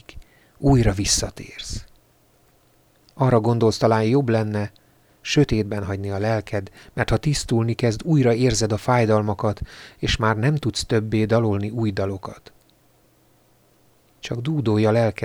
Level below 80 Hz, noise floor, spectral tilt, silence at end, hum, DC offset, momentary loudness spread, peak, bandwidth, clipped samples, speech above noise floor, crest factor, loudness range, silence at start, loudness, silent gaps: -38 dBFS; -58 dBFS; -5.5 dB/octave; 0 s; none; under 0.1%; 14 LU; -4 dBFS; 15 kHz; under 0.1%; 38 dB; 18 dB; 5 LU; 0.15 s; -21 LUFS; none